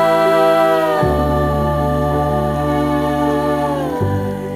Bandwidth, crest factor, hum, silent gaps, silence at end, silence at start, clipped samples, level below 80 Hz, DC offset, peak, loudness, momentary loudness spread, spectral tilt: 16 kHz; 12 dB; none; none; 0 s; 0 s; under 0.1%; -30 dBFS; under 0.1%; -2 dBFS; -16 LUFS; 6 LU; -7 dB/octave